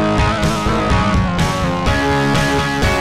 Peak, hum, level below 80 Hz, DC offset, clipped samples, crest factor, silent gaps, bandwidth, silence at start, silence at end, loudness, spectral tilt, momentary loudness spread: -4 dBFS; none; -24 dBFS; 2%; under 0.1%; 12 dB; none; 15.5 kHz; 0 s; 0 s; -16 LUFS; -5.5 dB/octave; 2 LU